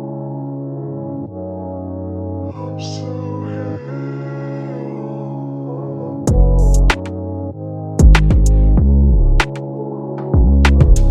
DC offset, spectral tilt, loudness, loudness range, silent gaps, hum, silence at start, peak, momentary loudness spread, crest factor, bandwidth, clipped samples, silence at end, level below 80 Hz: under 0.1%; -7 dB/octave; -18 LUFS; 11 LU; none; none; 0 s; 0 dBFS; 14 LU; 14 dB; 10.5 kHz; under 0.1%; 0 s; -16 dBFS